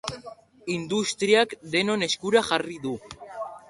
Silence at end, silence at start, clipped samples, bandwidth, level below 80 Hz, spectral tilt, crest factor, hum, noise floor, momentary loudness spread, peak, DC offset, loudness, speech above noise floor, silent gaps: 0.1 s; 0.05 s; under 0.1%; 11.5 kHz; -62 dBFS; -3.5 dB/octave; 20 dB; none; -46 dBFS; 16 LU; -6 dBFS; under 0.1%; -24 LUFS; 21 dB; none